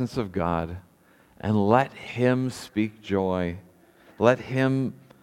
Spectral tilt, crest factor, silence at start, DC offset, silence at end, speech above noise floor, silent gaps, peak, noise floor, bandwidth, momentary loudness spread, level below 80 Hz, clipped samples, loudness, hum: -7 dB/octave; 22 dB; 0 s; under 0.1%; 0.25 s; 33 dB; none; -4 dBFS; -58 dBFS; 14.5 kHz; 11 LU; -54 dBFS; under 0.1%; -25 LUFS; none